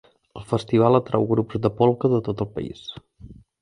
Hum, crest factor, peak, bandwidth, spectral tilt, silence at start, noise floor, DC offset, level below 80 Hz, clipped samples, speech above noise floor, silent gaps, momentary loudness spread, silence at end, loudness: none; 20 dB; -2 dBFS; 11 kHz; -8.5 dB/octave; 0.35 s; -46 dBFS; under 0.1%; -52 dBFS; under 0.1%; 24 dB; none; 19 LU; 0.3 s; -22 LUFS